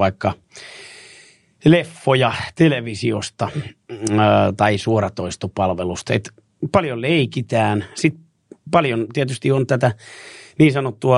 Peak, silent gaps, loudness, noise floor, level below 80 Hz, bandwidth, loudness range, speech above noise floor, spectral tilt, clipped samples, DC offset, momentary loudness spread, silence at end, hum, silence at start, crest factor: 0 dBFS; none; -19 LUFS; -49 dBFS; -52 dBFS; 11.5 kHz; 2 LU; 31 dB; -6 dB/octave; under 0.1%; under 0.1%; 19 LU; 0 s; none; 0 s; 18 dB